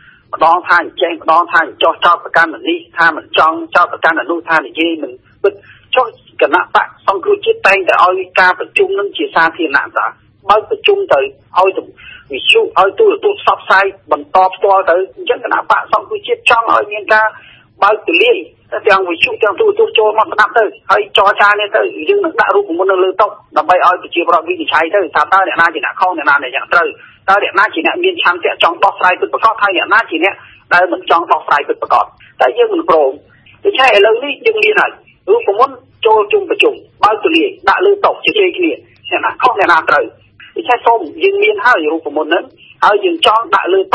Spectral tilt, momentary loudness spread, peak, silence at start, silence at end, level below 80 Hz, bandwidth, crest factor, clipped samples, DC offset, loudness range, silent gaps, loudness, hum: -3.5 dB/octave; 7 LU; 0 dBFS; 0.35 s; 0.05 s; -54 dBFS; 11 kHz; 12 dB; 0.4%; under 0.1%; 2 LU; none; -11 LUFS; none